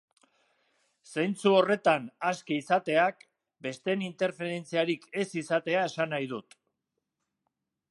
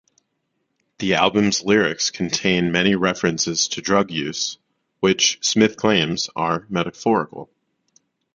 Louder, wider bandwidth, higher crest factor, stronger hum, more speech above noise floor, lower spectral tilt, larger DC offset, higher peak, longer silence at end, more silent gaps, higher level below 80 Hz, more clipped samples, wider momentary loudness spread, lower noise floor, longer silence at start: second, -29 LUFS vs -19 LUFS; first, 11.5 kHz vs 9.4 kHz; about the same, 22 dB vs 22 dB; neither; about the same, 56 dB vs 53 dB; first, -5 dB/octave vs -3.5 dB/octave; neither; second, -8 dBFS vs 0 dBFS; first, 1.5 s vs 0.9 s; neither; second, -82 dBFS vs -54 dBFS; neither; first, 11 LU vs 7 LU; first, -84 dBFS vs -73 dBFS; about the same, 1.1 s vs 1 s